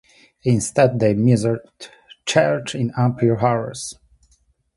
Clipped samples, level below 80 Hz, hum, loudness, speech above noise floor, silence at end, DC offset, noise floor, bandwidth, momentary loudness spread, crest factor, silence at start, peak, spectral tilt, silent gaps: under 0.1%; -52 dBFS; none; -19 LUFS; 43 dB; 0.85 s; under 0.1%; -61 dBFS; 11.5 kHz; 15 LU; 18 dB; 0.45 s; -2 dBFS; -6 dB/octave; none